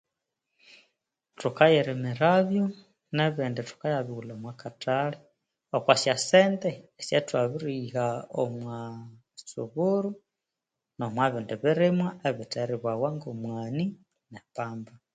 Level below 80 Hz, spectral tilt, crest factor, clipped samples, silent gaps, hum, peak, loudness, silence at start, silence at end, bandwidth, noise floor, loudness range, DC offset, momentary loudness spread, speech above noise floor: -72 dBFS; -5.5 dB/octave; 24 dB; under 0.1%; none; none; -4 dBFS; -28 LUFS; 1.4 s; 0.3 s; 9.4 kHz; -87 dBFS; 6 LU; under 0.1%; 17 LU; 60 dB